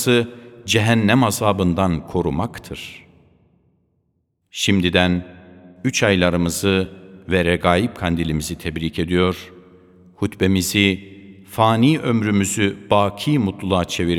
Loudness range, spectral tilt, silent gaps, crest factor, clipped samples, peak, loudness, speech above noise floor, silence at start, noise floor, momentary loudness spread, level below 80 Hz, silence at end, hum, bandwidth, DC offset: 5 LU; -5 dB/octave; none; 20 dB; under 0.1%; 0 dBFS; -19 LUFS; 50 dB; 0 s; -69 dBFS; 12 LU; -42 dBFS; 0 s; none; 18 kHz; under 0.1%